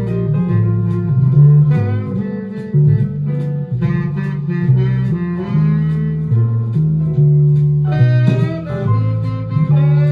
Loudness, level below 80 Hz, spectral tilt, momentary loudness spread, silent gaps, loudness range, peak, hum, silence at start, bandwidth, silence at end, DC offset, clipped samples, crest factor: -15 LUFS; -40 dBFS; -11 dB/octave; 8 LU; none; 3 LU; 0 dBFS; none; 0 s; 4.7 kHz; 0 s; under 0.1%; under 0.1%; 14 dB